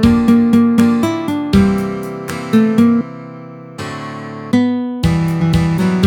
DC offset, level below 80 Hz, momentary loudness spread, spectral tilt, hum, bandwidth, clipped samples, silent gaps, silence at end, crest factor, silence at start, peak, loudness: under 0.1%; -34 dBFS; 16 LU; -7.5 dB/octave; none; 15.5 kHz; under 0.1%; none; 0 s; 14 dB; 0 s; 0 dBFS; -14 LUFS